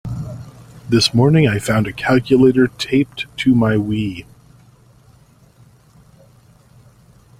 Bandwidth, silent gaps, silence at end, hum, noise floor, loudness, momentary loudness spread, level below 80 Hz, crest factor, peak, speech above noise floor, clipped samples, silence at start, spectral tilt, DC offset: 16 kHz; none; 3.2 s; none; -49 dBFS; -16 LUFS; 16 LU; -46 dBFS; 18 dB; 0 dBFS; 34 dB; under 0.1%; 0.05 s; -6 dB/octave; under 0.1%